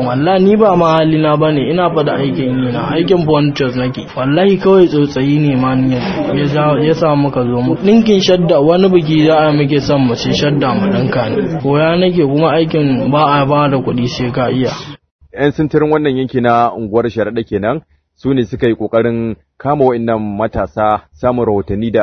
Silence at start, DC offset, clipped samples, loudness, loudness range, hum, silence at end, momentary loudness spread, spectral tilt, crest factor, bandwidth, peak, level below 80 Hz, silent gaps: 0 s; under 0.1%; under 0.1%; -13 LUFS; 4 LU; none; 0 s; 7 LU; -7.5 dB/octave; 12 dB; 6.6 kHz; 0 dBFS; -40 dBFS; 15.11-15.19 s